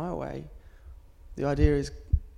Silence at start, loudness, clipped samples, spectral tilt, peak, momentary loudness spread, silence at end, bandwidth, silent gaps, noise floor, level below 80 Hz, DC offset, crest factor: 0 s; -29 LUFS; under 0.1%; -7.5 dB/octave; -8 dBFS; 20 LU; 0.05 s; 11 kHz; none; -49 dBFS; -34 dBFS; under 0.1%; 20 dB